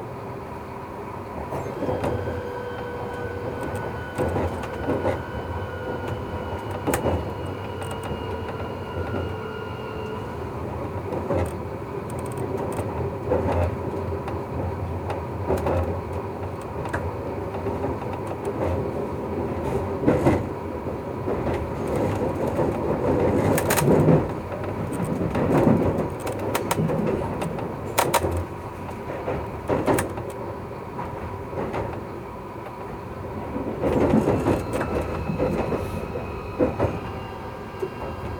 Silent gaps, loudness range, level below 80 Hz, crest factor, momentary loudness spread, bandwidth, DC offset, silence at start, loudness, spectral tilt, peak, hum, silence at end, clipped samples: none; 8 LU; -40 dBFS; 22 dB; 12 LU; over 20 kHz; under 0.1%; 0 s; -27 LUFS; -6.5 dB/octave; -4 dBFS; none; 0 s; under 0.1%